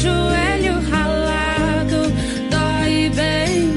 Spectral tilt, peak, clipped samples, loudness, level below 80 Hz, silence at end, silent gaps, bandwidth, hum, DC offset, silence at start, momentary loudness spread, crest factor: -5.5 dB/octave; -6 dBFS; under 0.1%; -18 LUFS; -28 dBFS; 0 s; none; 11.5 kHz; none; under 0.1%; 0 s; 2 LU; 12 dB